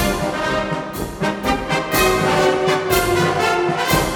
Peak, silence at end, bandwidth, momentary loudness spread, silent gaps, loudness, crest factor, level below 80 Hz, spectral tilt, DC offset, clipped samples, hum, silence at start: -4 dBFS; 0 s; over 20 kHz; 7 LU; none; -18 LUFS; 14 dB; -34 dBFS; -4 dB/octave; under 0.1%; under 0.1%; none; 0 s